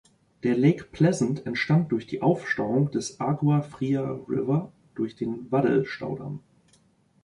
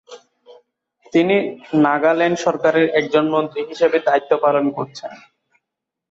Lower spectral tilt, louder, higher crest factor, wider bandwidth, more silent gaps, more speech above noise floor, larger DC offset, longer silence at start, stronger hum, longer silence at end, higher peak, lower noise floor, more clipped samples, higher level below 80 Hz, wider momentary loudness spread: about the same, -7 dB/octave vs -6 dB/octave; second, -26 LUFS vs -17 LUFS; about the same, 18 dB vs 16 dB; first, 11 kHz vs 7.8 kHz; neither; second, 38 dB vs 65 dB; neither; first, 0.45 s vs 0.1 s; neither; about the same, 0.85 s vs 0.95 s; second, -8 dBFS vs -2 dBFS; second, -63 dBFS vs -82 dBFS; neither; about the same, -62 dBFS vs -66 dBFS; about the same, 10 LU vs 9 LU